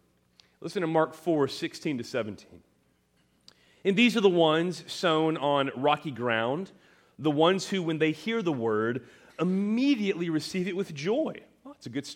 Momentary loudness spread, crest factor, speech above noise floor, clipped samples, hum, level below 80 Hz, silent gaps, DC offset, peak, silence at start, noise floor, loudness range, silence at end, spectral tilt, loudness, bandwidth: 13 LU; 20 dB; 41 dB; under 0.1%; none; -74 dBFS; none; under 0.1%; -8 dBFS; 0.6 s; -68 dBFS; 6 LU; 0 s; -5.5 dB/octave; -28 LUFS; 16 kHz